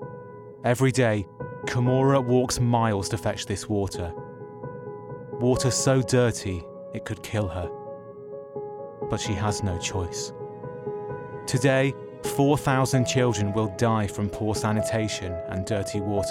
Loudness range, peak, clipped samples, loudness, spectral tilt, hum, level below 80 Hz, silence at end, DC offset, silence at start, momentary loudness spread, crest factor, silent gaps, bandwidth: 7 LU; -8 dBFS; under 0.1%; -25 LUFS; -5.5 dB/octave; none; -52 dBFS; 0 s; under 0.1%; 0 s; 16 LU; 18 dB; none; 16 kHz